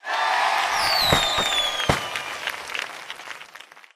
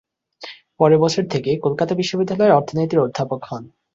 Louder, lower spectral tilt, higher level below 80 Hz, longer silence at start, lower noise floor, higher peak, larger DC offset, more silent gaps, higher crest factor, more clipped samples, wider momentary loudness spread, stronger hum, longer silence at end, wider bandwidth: second, -21 LUFS vs -18 LUFS; second, -2 dB/octave vs -6.5 dB/octave; first, -46 dBFS vs -58 dBFS; second, 0.05 s vs 0.4 s; first, -46 dBFS vs -40 dBFS; about the same, -4 dBFS vs -2 dBFS; neither; neither; about the same, 20 dB vs 18 dB; neither; second, 17 LU vs 20 LU; neither; about the same, 0.15 s vs 0.25 s; first, 15.5 kHz vs 7.8 kHz